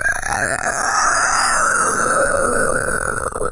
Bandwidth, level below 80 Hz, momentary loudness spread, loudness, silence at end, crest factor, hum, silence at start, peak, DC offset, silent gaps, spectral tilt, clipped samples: 11.5 kHz; -34 dBFS; 5 LU; -17 LUFS; 0 s; 12 dB; none; 0 s; -6 dBFS; under 0.1%; none; -2 dB/octave; under 0.1%